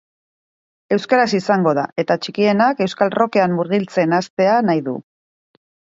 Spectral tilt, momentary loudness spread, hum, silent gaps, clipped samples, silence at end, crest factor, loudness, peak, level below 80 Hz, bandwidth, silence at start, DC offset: -6.5 dB/octave; 6 LU; none; 1.92-1.96 s, 4.30-4.37 s; under 0.1%; 0.95 s; 18 dB; -17 LUFS; 0 dBFS; -66 dBFS; 7.8 kHz; 0.9 s; under 0.1%